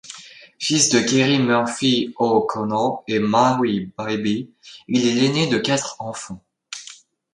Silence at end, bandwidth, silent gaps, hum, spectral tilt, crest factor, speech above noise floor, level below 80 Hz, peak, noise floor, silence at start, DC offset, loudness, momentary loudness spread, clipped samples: 0.4 s; 11.5 kHz; none; none; -4 dB/octave; 18 dB; 25 dB; -60 dBFS; -2 dBFS; -45 dBFS; 0.05 s; under 0.1%; -19 LUFS; 18 LU; under 0.1%